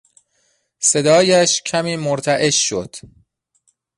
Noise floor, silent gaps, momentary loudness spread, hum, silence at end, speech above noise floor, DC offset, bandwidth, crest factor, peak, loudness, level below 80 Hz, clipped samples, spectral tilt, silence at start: -64 dBFS; none; 12 LU; none; 0.9 s; 48 dB; under 0.1%; 11.5 kHz; 16 dB; -2 dBFS; -16 LUFS; -56 dBFS; under 0.1%; -3 dB/octave; 0.8 s